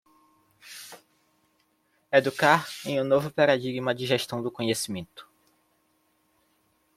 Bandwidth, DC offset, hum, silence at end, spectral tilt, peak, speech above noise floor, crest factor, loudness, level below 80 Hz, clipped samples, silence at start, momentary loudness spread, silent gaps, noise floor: 16 kHz; under 0.1%; none; 1.75 s; -4.5 dB/octave; -4 dBFS; 45 dB; 24 dB; -25 LUFS; -68 dBFS; under 0.1%; 0.65 s; 21 LU; none; -70 dBFS